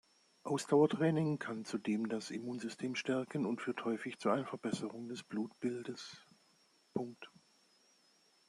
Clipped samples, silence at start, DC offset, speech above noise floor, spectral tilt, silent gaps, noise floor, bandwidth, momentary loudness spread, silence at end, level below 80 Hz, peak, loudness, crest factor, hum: under 0.1%; 0.45 s; under 0.1%; 34 dB; -6 dB/octave; none; -71 dBFS; 12.5 kHz; 15 LU; 1.2 s; -82 dBFS; -18 dBFS; -38 LUFS; 22 dB; none